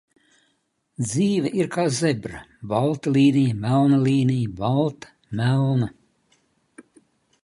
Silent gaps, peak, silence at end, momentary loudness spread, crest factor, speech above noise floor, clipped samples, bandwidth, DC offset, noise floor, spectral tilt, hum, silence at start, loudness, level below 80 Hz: none; -8 dBFS; 1.55 s; 12 LU; 16 dB; 50 dB; under 0.1%; 11.5 kHz; under 0.1%; -70 dBFS; -6.5 dB/octave; none; 1 s; -22 LUFS; -56 dBFS